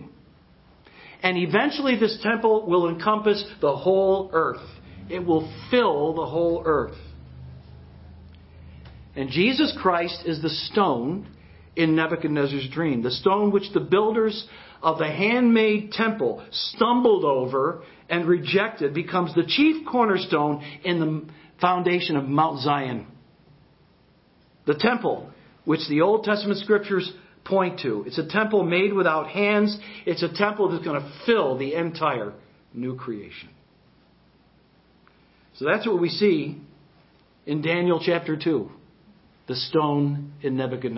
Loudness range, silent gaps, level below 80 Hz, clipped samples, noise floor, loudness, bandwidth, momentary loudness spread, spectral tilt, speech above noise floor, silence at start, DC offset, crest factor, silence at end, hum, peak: 6 LU; none; -56 dBFS; under 0.1%; -58 dBFS; -23 LUFS; 5.8 kHz; 13 LU; -10 dB/octave; 36 dB; 0 s; under 0.1%; 22 dB; 0 s; none; -2 dBFS